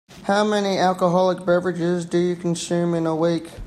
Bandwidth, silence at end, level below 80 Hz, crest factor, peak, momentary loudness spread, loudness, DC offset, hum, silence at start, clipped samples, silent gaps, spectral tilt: 12.5 kHz; 0 s; -56 dBFS; 16 dB; -6 dBFS; 4 LU; -21 LUFS; under 0.1%; none; 0.1 s; under 0.1%; none; -6 dB/octave